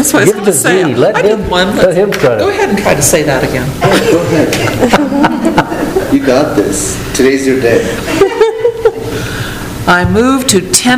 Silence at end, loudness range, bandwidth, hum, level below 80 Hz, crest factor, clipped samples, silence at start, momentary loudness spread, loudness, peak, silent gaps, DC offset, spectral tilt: 0 s; 2 LU; over 20 kHz; none; -30 dBFS; 10 dB; 0.8%; 0 s; 6 LU; -10 LUFS; 0 dBFS; none; under 0.1%; -4 dB/octave